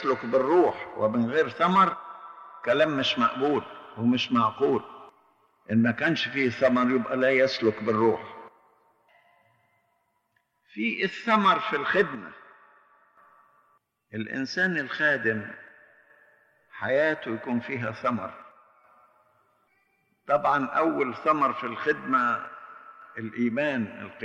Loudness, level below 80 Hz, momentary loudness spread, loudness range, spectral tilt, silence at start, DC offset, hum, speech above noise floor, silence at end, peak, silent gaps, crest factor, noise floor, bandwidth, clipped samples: -25 LUFS; -72 dBFS; 18 LU; 6 LU; -6 dB/octave; 0 s; under 0.1%; none; 48 dB; 0 s; -8 dBFS; none; 18 dB; -73 dBFS; 7.8 kHz; under 0.1%